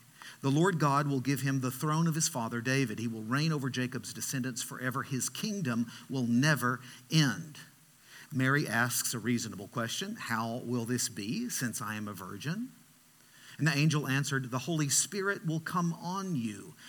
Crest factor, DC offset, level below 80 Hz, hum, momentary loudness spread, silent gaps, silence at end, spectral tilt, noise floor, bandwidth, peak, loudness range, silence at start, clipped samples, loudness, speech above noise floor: 20 dB; under 0.1%; -80 dBFS; none; 10 LU; none; 0 s; -4.5 dB/octave; -61 dBFS; 19 kHz; -12 dBFS; 4 LU; 0.2 s; under 0.1%; -32 LUFS; 29 dB